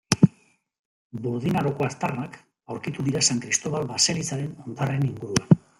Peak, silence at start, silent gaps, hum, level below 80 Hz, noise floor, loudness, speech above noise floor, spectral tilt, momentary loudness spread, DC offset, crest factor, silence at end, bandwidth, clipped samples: -2 dBFS; 0.1 s; 0.79-1.10 s; none; -58 dBFS; -60 dBFS; -25 LUFS; 35 dB; -4.5 dB/octave; 13 LU; under 0.1%; 24 dB; 0.2 s; 14.5 kHz; under 0.1%